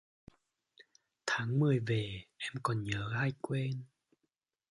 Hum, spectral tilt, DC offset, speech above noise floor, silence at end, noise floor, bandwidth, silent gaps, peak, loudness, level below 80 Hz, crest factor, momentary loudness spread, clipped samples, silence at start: none; -6 dB/octave; under 0.1%; 51 dB; 0.85 s; -85 dBFS; 11.5 kHz; none; -14 dBFS; -35 LUFS; -64 dBFS; 22 dB; 11 LU; under 0.1%; 0.8 s